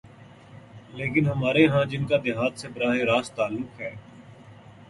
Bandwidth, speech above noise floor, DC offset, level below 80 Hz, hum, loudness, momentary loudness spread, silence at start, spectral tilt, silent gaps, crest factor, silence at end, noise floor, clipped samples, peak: 11.5 kHz; 24 dB; under 0.1%; -58 dBFS; none; -24 LUFS; 16 LU; 0.05 s; -6.5 dB/octave; none; 20 dB; 0.05 s; -48 dBFS; under 0.1%; -6 dBFS